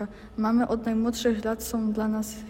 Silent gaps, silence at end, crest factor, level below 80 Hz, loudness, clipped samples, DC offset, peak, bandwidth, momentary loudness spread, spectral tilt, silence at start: none; 0 s; 14 dB; -48 dBFS; -27 LUFS; under 0.1%; under 0.1%; -12 dBFS; 16.5 kHz; 4 LU; -5 dB/octave; 0 s